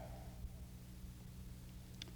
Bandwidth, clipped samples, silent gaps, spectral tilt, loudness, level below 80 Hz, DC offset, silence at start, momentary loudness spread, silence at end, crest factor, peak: over 20 kHz; under 0.1%; none; -5 dB/octave; -54 LUFS; -56 dBFS; under 0.1%; 0 s; 2 LU; 0 s; 24 dB; -28 dBFS